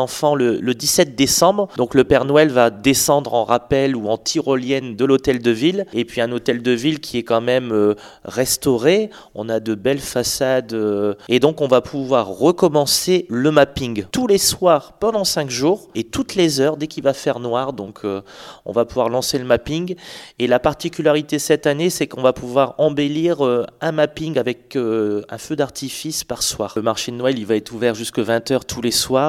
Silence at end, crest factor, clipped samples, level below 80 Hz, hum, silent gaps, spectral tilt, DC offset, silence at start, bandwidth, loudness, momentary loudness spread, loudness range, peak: 0 s; 18 dB; under 0.1%; -48 dBFS; none; none; -4 dB/octave; under 0.1%; 0 s; 16.5 kHz; -18 LUFS; 9 LU; 5 LU; 0 dBFS